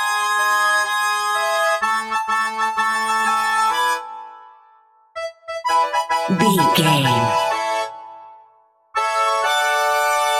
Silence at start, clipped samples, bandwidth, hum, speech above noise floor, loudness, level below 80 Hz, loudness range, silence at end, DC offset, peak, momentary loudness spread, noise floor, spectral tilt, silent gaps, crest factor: 0 s; under 0.1%; 16.5 kHz; none; 39 dB; -18 LUFS; -60 dBFS; 3 LU; 0 s; under 0.1%; -2 dBFS; 13 LU; -55 dBFS; -3.5 dB/octave; none; 18 dB